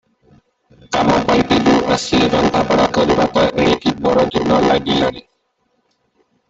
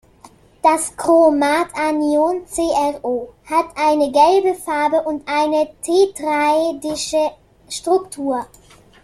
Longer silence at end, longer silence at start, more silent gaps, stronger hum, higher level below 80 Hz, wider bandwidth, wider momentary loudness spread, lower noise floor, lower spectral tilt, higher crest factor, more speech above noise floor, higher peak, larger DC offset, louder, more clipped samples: first, 1.3 s vs 0.6 s; first, 0.9 s vs 0.25 s; neither; neither; first, -40 dBFS vs -52 dBFS; second, 8.2 kHz vs 14 kHz; second, 4 LU vs 10 LU; first, -65 dBFS vs -47 dBFS; first, -5 dB/octave vs -3 dB/octave; about the same, 14 dB vs 16 dB; first, 51 dB vs 30 dB; about the same, -2 dBFS vs -2 dBFS; neither; about the same, -15 LUFS vs -17 LUFS; neither